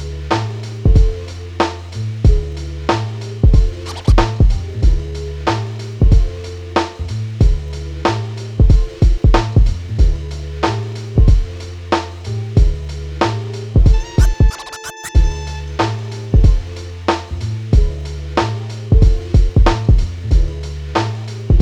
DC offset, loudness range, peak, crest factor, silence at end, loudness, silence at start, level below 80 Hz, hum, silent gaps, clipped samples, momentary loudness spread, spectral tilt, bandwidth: under 0.1%; 2 LU; 0 dBFS; 14 dB; 0 s; -17 LUFS; 0 s; -16 dBFS; none; none; under 0.1%; 11 LU; -6.5 dB/octave; 9.6 kHz